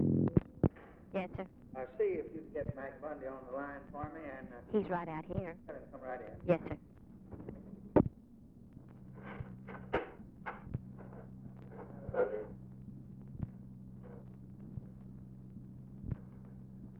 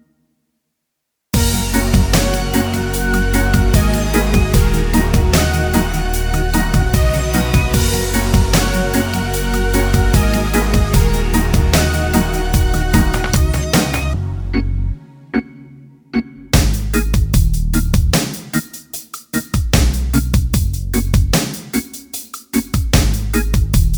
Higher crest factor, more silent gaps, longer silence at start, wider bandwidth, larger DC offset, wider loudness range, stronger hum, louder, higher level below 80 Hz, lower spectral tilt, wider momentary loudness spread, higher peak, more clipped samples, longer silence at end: first, 26 dB vs 14 dB; neither; second, 0 s vs 1.35 s; second, 5.2 kHz vs over 20 kHz; neither; first, 10 LU vs 3 LU; neither; second, -40 LUFS vs -16 LUFS; second, -58 dBFS vs -18 dBFS; first, -10.5 dB/octave vs -5 dB/octave; first, 17 LU vs 8 LU; second, -14 dBFS vs 0 dBFS; neither; about the same, 0 s vs 0 s